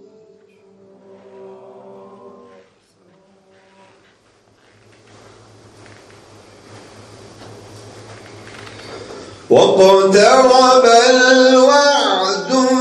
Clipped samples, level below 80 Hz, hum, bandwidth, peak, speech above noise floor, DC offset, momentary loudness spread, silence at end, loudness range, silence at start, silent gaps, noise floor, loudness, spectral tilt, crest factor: under 0.1%; -58 dBFS; none; 12 kHz; 0 dBFS; 45 dB; under 0.1%; 25 LU; 0 s; 18 LU; 8.85 s; none; -54 dBFS; -10 LUFS; -3 dB/octave; 16 dB